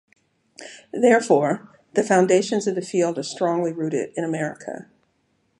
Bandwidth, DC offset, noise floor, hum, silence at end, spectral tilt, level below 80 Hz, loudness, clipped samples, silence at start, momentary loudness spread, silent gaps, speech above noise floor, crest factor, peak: 11.5 kHz; under 0.1%; -68 dBFS; none; 0.75 s; -5 dB/octave; -74 dBFS; -21 LUFS; under 0.1%; 0.6 s; 18 LU; none; 46 dB; 20 dB; -2 dBFS